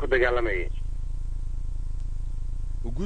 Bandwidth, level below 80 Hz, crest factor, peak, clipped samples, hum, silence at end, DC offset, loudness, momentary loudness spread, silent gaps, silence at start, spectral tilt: 9 kHz; -28 dBFS; 16 dB; -10 dBFS; under 0.1%; none; 0 s; under 0.1%; -31 LUFS; 13 LU; none; 0 s; -7 dB/octave